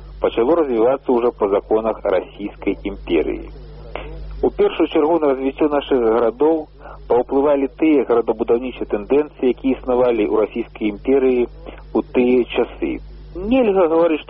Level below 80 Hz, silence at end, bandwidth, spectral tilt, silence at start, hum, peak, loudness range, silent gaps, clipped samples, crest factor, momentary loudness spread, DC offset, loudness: -38 dBFS; 0.05 s; 5.4 kHz; -5 dB/octave; 0 s; none; -6 dBFS; 3 LU; none; under 0.1%; 12 dB; 12 LU; under 0.1%; -18 LUFS